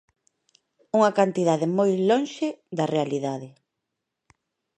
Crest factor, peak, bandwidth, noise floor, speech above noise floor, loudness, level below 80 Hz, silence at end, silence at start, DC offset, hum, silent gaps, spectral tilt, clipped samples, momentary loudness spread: 20 dB; -6 dBFS; 10 kHz; -83 dBFS; 60 dB; -24 LUFS; -76 dBFS; 1.3 s; 0.95 s; under 0.1%; none; none; -6 dB/octave; under 0.1%; 9 LU